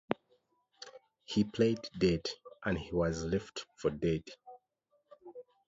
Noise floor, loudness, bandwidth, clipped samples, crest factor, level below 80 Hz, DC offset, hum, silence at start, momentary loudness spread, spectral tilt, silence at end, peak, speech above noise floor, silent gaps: -77 dBFS; -34 LUFS; 7.8 kHz; under 0.1%; 26 dB; -56 dBFS; under 0.1%; none; 0.1 s; 21 LU; -6 dB/octave; 0.25 s; -10 dBFS; 44 dB; none